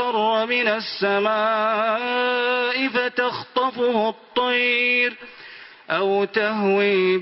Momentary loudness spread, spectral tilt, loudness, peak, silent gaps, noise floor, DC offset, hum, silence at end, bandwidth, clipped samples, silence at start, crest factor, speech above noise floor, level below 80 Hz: 6 LU; -8.5 dB/octave; -20 LUFS; -6 dBFS; none; -43 dBFS; under 0.1%; none; 0 s; 5.8 kHz; under 0.1%; 0 s; 16 dB; 22 dB; -68 dBFS